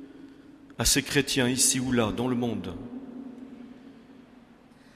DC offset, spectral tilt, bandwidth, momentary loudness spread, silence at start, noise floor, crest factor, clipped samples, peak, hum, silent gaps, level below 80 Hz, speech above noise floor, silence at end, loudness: under 0.1%; -3 dB/octave; 15.5 kHz; 23 LU; 0 s; -54 dBFS; 20 dB; under 0.1%; -10 dBFS; none; none; -48 dBFS; 28 dB; 0.8 s; -25 LUFS